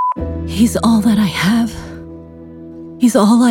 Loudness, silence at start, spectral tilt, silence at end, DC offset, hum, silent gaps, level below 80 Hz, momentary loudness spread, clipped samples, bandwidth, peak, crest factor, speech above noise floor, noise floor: -14 LUFS; 0 s; -5.5 dB/octave; 0 s; under 0.1%; none; none; -34 dBFS; 22 LU; under 0.1%; 17 kHz; 0 dBFS; 14 dB; 22 dB; -34 dBFS